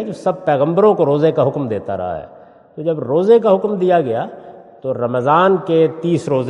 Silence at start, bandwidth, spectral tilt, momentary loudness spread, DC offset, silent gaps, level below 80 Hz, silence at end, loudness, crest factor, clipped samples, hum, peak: 0 s; 10 kHz; -8 dB/octave; 11 LU; under 0.1%; none; -60 dBFS; 0 s; -16 LUFS; 16 dB; under 0.1%; none; 0 dBFS